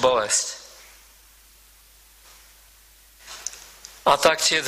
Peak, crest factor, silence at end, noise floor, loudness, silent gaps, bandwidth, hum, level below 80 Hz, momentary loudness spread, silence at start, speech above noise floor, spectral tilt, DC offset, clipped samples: -4 dBFS; 22 dB; 0 s; -53 dBFS; -21 LUFS; none; 15.5 kHz; none; -58 dBFS; 25 LU; 0 s; 33 dB; -0.5 dB/octave; under 0.1%; under 0.1%